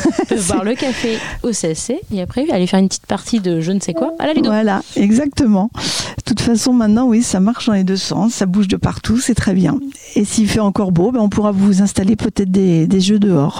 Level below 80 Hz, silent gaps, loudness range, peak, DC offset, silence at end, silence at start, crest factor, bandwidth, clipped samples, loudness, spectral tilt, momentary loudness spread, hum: -38 dBFS; none; 3 LU; -2 dBFS; 0.5%; 0 s; 0 s; 12 dB; 15 kHz; under 0.1%; -15 LUFS; -5.5 dB/octave; 6 LU; none